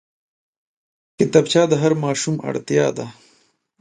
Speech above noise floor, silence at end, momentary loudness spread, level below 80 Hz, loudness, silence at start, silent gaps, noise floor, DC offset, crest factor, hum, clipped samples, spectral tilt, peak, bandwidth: 43 dB; 0.7 s; 10 LU; -62 dBFS; -18 LUFS; 1.2 s; none; -61 dBFS; under 0.1%; 20 dB; none; under 0.1%; -5 dB/octave; 0 dBFS; 11 kHz